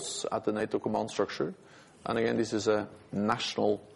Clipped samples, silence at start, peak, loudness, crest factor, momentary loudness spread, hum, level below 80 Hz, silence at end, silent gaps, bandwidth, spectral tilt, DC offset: under 0.1%; 0 s; -12 dBFS; -31 LUFS; 18 dB; 7 LU; none; -66 dBFS; 0 s; none; 11.5 kHz; -4.5 dB/octave; under 0.1%